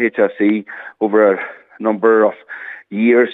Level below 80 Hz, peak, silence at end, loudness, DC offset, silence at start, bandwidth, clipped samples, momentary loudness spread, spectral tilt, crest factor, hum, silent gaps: -80 dBFS; 0 dBFS; 0 s; -15 LUFS; under 0.1%; 0 s; 4 kHz; under 0.1%; 17 LU; -9 dB/octave; 14 dB; none; none